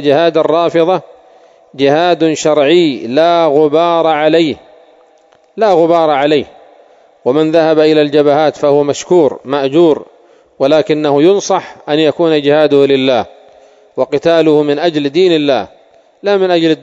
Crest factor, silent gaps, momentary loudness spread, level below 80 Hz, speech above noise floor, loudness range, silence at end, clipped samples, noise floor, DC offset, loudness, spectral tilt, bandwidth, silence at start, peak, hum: 12 dB; none; 7 LU; -58 dBFS; 38 dB; 2 LU; 0.05 s; 0.3%; -48 dBFS; under 0.1%; -11 LUFS; -5.5 dB/octave; 7.8 kHz; 0 s; 0 dBFS; none